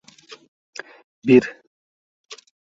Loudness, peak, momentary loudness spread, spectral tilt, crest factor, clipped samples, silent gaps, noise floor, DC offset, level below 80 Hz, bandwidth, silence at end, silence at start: -17 LUFS; -2 dBFS; 26 LU; -6.5 dB/octave; 22 dB; under 0.1%; 1.67-2.24 s; under -90 dBFS; under 0.1%; -66 dBFS; 7.6 kHz; 0.45 s; 1.25 s